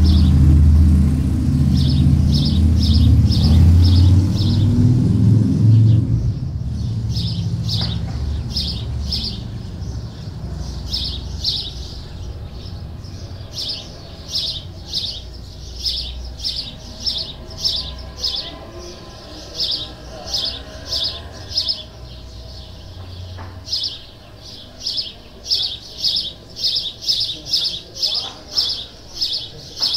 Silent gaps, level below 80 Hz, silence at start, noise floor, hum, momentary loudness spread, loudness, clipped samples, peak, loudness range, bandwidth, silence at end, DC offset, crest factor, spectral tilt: none; -26 dBFS; 0 s; -38 dBFS; none; 20 LU; -18 LUFS; under 0.1%; -2 dBFS; 12 LU; 13 kHz; 0 s; under 0.1%; 16 dB; -6 dB/octave